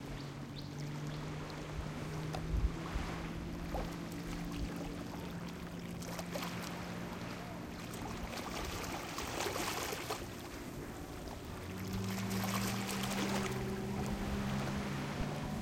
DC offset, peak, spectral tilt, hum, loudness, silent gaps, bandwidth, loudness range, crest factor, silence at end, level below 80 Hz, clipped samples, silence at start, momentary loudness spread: under 0.1%; -20 dBFS; -5 dB/octave; none; -41 LUFS; none; 17 kHz; 5 LU; 20 dB; 0 s; -48 dBFS; under 0.1%; 0 s; 8 LU